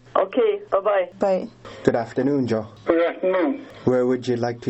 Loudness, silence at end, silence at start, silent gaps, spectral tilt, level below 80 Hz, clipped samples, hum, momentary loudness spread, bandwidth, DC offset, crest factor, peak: -22 LUFS; 0 s; 0.15 s; none; -7.5 dB/octave; -58 dBFS; under 0.1%; none; 5 LU; 8.2 kHz; under 0.1%; 20 dB; -2 dBFS